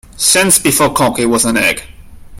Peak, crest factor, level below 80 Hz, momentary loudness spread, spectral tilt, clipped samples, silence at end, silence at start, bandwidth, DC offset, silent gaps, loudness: 0 dBFS; 14 dB; -38 dBFS; 5 LU; -2.5 dB/octave; under 0.1%; 0 s; 0.15 s; over 20 kHz; under 0.1%; none; -10 LUFS